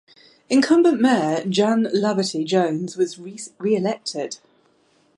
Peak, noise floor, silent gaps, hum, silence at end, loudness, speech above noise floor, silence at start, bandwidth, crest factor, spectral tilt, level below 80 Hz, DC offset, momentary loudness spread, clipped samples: -6 dBFS; -61 dBFS; none; none; 0.8 s; -20 LUFS; 41 dB; 0.5 s; 11.5 kHz; 16 dB; -5 dB/octave; -70 dBFS; under 0.1%; 13 LU; under 0.1%